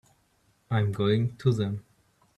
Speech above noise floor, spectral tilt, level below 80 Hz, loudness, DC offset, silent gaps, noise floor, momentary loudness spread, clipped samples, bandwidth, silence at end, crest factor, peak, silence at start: 42 dB; -8 dB/octave; -62 dBFS; -27 LUFS; under 0.1%; none; -68 dBFS; 7 LU; under 0.1%; 10.5 kHz; 0.55 s; 18 dB; -12 dBFS; 0.7 s